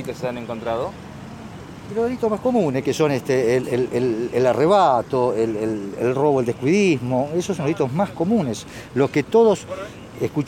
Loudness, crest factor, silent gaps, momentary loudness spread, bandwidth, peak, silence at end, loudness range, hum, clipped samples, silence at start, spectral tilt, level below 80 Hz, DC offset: -20 LUFS; 16 dB; none; 15 LU; 17 kHz; -4 dBFS; 0 s; 3 LU; none; under 0.1%; 0 s; -6.5 dB/octave; -52 dBFS; under 0.1%